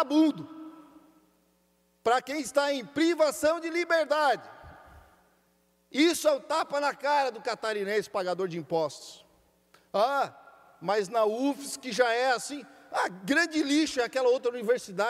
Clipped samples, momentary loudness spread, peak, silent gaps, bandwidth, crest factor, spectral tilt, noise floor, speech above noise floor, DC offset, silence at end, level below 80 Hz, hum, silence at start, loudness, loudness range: under 0.1%; 10 LU; -10 dBFS; none; 15.5 kHz; 18 dB; -3.5 dB/octave; -69 dBFS; 42 dB; under 0.1%; 0 s; -70 dBFS; none; 0 s; -28 LUFS; 4 LU